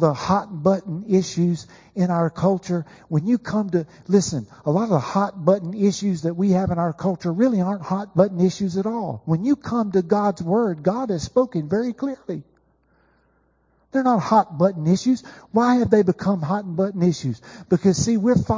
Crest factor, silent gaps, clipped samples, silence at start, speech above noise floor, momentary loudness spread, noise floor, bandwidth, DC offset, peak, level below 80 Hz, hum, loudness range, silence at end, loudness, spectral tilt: 18 dB; none; under 0.1%; 0 s; 42 dB; 8 LU; -63 dBFS; 7.6 kHz; under 0.1%; -2 dBFS; -50 dBFS; none; 4 LU; 0 s; -21 LUFS; -7 dB/octave